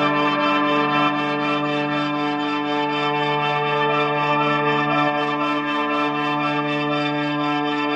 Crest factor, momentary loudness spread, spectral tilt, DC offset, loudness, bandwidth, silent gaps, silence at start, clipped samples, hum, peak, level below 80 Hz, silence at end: 14 dB; 3 LU; -6 dB/octave; under 0.1%; -20 LUFS; 8 kHz; none; 0 s; under 0.1%; none; -8 dBFS; -70 dBFS; 0 s